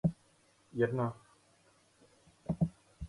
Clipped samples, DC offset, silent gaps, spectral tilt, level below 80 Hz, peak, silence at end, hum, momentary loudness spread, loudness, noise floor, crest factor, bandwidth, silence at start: under 0.1%; under 0.1%; none; -9 dB/octave; -58 dBFS; -18 dBFS; 0 s; none; 20 LU; -36 LUFS; -68 dBFS; 20 dB; 11.5 kHz; 0.05 s